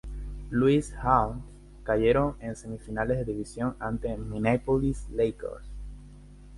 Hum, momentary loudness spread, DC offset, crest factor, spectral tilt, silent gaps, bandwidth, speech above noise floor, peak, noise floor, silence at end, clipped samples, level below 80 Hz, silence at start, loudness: 50 Hz at -45 dBFS; 18 LU; under 0.1%; 20 dB; -7.5 dB/octave; none; 11.5 kHz; 21 dB; -8 dBFS; -48 dBFS; 0 s; under 0.1%; -40 dBFS; 0.05 s; -28 LUFS